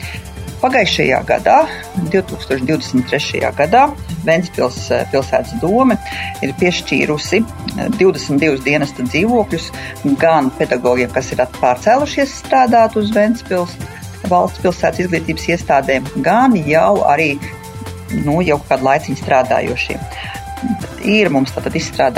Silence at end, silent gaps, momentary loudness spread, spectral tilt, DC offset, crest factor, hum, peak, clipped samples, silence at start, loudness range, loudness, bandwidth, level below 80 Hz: 0 s; none; 10 LU; -5.5 dB/octave; under 0.1%; 14 dB; none; 0 dBFS; under 0.1%; 0 s; 2 LU; -15 LUFS; 16 kHz; -38 dBFS